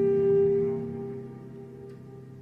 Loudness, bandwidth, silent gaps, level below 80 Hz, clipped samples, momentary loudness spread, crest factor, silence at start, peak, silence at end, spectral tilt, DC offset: -26 LUFS; 2.9 kHz; none; -62 dBFS; under 0.1%; 22 LU; 12 dB; 0 s; -16 dBFS; 0 s; -10.5 dB/octave; under 0.1%